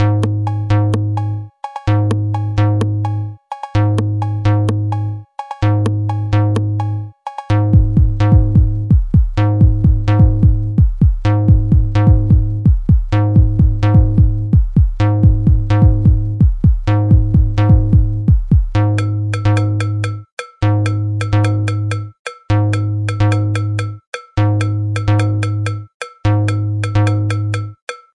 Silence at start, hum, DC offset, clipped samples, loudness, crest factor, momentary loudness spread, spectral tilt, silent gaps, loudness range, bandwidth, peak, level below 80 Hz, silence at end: 0 s; none; under 0.1%; under 0.1%; -15 LUFS; 12 dB; 10 LU; -8 dB/octave; 20.32-20.37 s, 22.19-22.25 s, 24.07-24.13 s, 25.94-26.00 s, 27.82-27.87 s; 5 LU; 9.8 kHz; 0 dBFS; -20 dBFS; 0.2 s